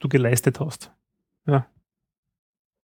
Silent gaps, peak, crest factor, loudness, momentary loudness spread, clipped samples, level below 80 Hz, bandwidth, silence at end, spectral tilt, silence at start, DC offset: none; -4 dBFS; 22 dB; -23 LUFS; 18 LU; under 0.1%; -62 dBFS; 18.5 kHz; 1.25 s; -6 dB/octave; 0 s; under 0.1%